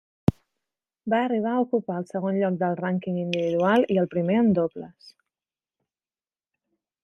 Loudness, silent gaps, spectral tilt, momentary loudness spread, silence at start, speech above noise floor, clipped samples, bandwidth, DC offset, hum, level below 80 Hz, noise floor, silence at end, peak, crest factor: -24 LUFS; none; -8 dB/octave; 9 LU; 0.3 s; over 66 dB; under 0.1%; 9.4 kHz; under 0.1%; none; -58 dBFS; under -90 dBFS; 2.15 s; -4 dBFS; 22 dB